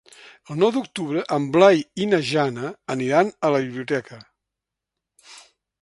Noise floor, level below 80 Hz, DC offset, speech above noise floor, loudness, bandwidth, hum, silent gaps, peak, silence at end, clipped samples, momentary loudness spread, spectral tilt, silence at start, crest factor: -85 dBFS; -66 dBFS; under 0.1%; 64 dB; -21 LUFS; 11.5 kHz; none; none; 0 dBFS; 0.4 s; under 0.1%; 11 LU; -6 dB/octave; 0.5 s; 22 dB